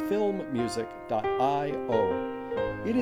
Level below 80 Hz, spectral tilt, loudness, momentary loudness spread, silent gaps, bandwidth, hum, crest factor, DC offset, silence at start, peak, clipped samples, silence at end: -56 dBFS; -6 dB/octave; -29 LUFS; 6 LU; none; 14.5 kHz; none; 16 dB; under 0.1%; 0 s; -14 dBFS; under 0.1%; 0 s